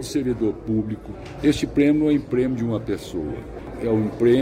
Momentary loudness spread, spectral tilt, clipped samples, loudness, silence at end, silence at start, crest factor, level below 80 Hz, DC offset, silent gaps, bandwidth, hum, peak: 12 LU; -7 dB/octave; under 0.1%; -23 LUFS; 0 s; 0 s; 14 dB; -42 dBFS; under 0.1%; none; 15 kHz; none; -8 dBFS